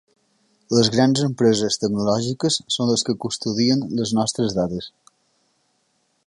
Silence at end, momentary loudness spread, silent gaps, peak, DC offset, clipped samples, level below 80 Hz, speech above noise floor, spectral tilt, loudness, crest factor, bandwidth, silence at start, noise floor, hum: 1.4 s; 7 LU; none; -2 dBFS; under 0.1%; under 0.1%; -56 dBFS; 48 dB; -4.5 dB/octave; -20 LUFS; 18 dB; 11.5 kHz; 0.7 s; -68 dBFS; none